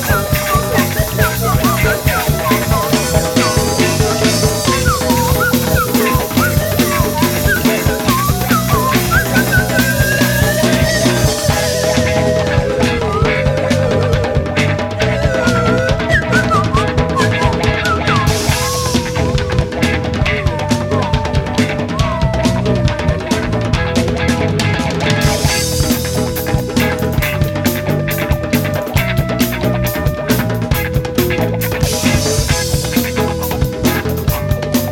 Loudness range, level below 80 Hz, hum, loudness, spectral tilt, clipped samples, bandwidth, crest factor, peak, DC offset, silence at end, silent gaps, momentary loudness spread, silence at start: 3 LU; -26 dBFS; none; -14 LUFS; -4.5 dB/octave; under 0.1%; 18 kHz; 14 dB; 0 dBFS; under 0.1%; 0 s; none; 4 LU; 0 s